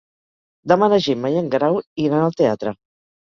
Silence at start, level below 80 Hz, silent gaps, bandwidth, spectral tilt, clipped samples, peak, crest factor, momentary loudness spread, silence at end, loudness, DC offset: 0.65 s; -58 dBFS; 1.87-1.96 s; 7.2 kHz; -7 dB/octave; under 0.1%; -2 dBFS; 18 dB; 12 LU; 0.5 s; -19 LUFS; under 0.1%